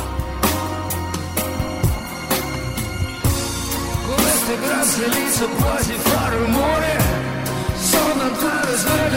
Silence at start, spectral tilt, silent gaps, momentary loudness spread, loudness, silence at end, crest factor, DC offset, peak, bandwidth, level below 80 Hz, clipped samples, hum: 0 s; -4 dB/octave; none; 7 LU; -19 LUFS; 0 s; 16 dB; under 0.1%; -4 dBFS; 16.5 kHz; -32 dBFS; under 0.1%; none